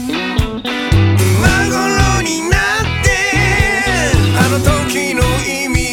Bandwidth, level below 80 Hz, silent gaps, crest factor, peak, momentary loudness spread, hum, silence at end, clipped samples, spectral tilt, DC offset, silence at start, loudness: 17.5 kHz; -22 dBFS; none; 12 dB; 0 dBFS; 5 LU; none; 0 s; under 0.1%; -4.5 dB/octave; under 0.1%; 0 s; -13 LUFS